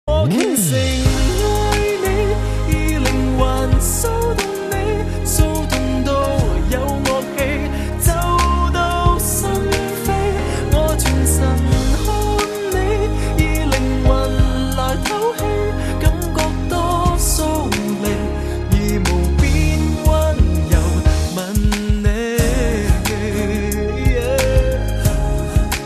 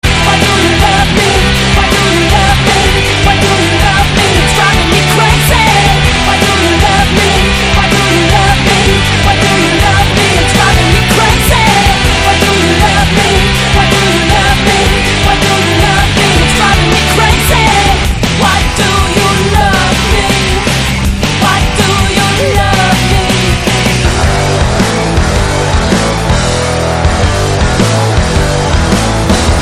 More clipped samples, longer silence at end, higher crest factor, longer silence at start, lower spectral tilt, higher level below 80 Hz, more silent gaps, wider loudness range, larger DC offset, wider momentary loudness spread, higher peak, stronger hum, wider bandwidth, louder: second, under 0.1% vs 0.3%; about the same, 0 s vs 0 s; first, 16 dB vs 8 dB; about the same, 0.05 s vs 0.05 s; about the same, -5 dB/octave vs -4 dB/octave; about the same, -20 dBFS vs -16 dBFS; neither; about the same, 1 LU vs 3 LU; neither; about the same, 4 LU vs 3 LU; about the same, 0 dBFS vs 0 dBFS; neither; second, 14 kHz vs 16 kHz; second, -18 LUFS vs -8 LUFS